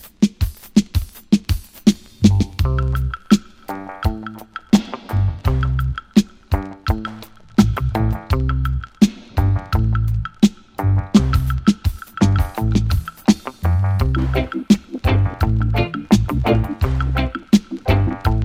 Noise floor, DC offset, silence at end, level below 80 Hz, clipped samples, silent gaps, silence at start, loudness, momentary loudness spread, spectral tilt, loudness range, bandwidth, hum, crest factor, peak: -37 dBFS; under 0.1%; 0 s; -26 dBFS; under 0.1%; none; 0.05 s; -19 LUFS; 7 LU; -7 dB/octave; 2 LU; 16 kHz; none; 18 dB; 0 dBFS